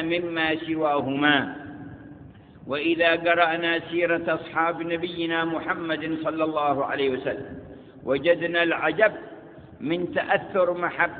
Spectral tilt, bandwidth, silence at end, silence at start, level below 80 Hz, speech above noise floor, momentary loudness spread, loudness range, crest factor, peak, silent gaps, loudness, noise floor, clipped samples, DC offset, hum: -9.5 dB/octave; 4.7 kHz; 0 s; 0 s; -60 dBFS; 22 dB; 18 LU; 2 LU; 22 dB; -4 dBFS; none; -24 LUFS; -46 dBFS; under 0.1%; under 0.1%; none